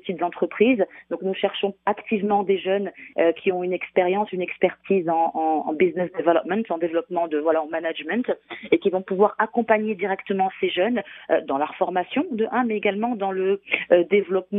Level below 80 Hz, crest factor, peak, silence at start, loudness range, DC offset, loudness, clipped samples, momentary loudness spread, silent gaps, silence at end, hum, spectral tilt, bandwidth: -70 dBFS; 20 dB; -2 dBFS; 0.05 s; 1 LU; under 0.1%; -23 LUFS; under 0.1%; 6 LU; none; 0 s; none; -4 dB/octave; 3.9 kHz